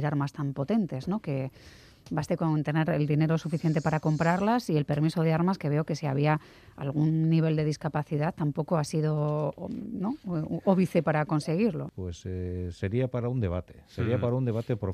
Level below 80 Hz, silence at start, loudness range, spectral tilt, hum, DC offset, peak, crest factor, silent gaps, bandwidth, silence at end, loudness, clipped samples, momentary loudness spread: -60 dBFS; 0 s; 3 LU; -8 dB/octave; none; under 0.1%; -10 dBFS; 18 dB; none; 11.5 kHz; 0 s; -29 LUFS; under 0.1%; 9 LU